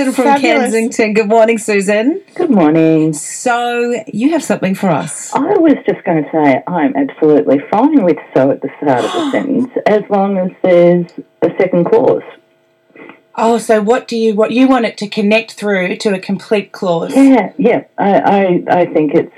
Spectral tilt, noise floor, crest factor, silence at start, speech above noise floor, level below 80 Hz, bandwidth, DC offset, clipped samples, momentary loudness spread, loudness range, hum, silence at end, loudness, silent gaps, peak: -6 dB/octave; -54 dBFS; 12 dB; 0 s; 42 dB; -62 dBFS; 13.5 kHz; under 0.1%; 0.3%; 7 LU; 2 LU; none; 0.1 s; -12 LUFS; none; 0 dBFS